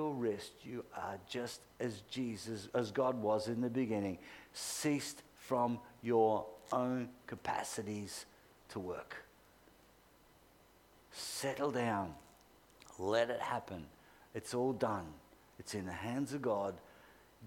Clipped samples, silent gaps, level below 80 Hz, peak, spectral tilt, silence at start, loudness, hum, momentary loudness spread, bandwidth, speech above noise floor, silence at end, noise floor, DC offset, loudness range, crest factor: under 0.1%; none; -72 dBFS; -20 dBFS; -5 dB/octave; 0 s; -39 LUFS; none; 15 LU; 19 kHz; 27 dB; 0 s; -66 dBFS; under 0.1%; 8 LU; 20 dB